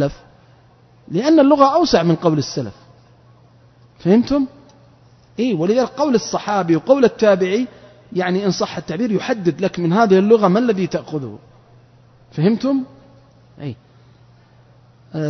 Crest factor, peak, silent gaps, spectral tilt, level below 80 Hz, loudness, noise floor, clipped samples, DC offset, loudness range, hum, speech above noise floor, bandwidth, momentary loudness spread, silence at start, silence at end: 18 dB; 0 dBFS; none; -6.5 dB/octave; -52 dBFS; -17 LUFS; -50 dBFS; under 0.1%; under 0.1%; 7 LU; none; 34 dB; 6.4 kHz; 15 LU; 0 s; 0 s